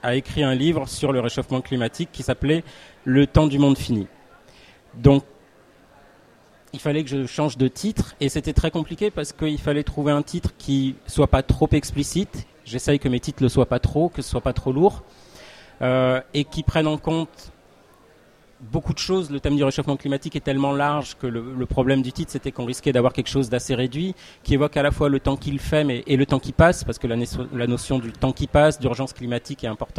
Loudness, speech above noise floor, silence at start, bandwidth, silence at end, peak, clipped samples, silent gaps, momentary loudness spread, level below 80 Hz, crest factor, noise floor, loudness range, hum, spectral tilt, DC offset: -22 LUFS; 32 dB; 0.05 s; 14.5 kHz; 0 s; 0 dBFS; under 0.1%; none; 10 LU; -36 dBFS; 22 dB; -53 dBFS; 4 LU; none; -6 dB/octave; under 0.1%